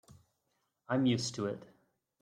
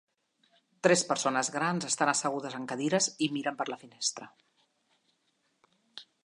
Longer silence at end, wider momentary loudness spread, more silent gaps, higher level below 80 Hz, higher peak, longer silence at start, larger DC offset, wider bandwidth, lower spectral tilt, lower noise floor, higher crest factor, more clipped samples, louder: first, 0.55 s vs 0.2 s; about the same, 10 LU vs 12 LU; neither; first, -74 dBFS vs -84 dBFS; second, -18 dBFS vs -8 dBFS; about the same, 0.9 s vs 0.85 s; neither; about the same, 10.5 kHz vs 11.5 kHz; first, -5 dB/octave vs -3 dB/octave; first, -81 dBFS vs -75 dBFS; second, 18 dB vs 26 dB; neither; second, -34 LUFS vs -30 LUFS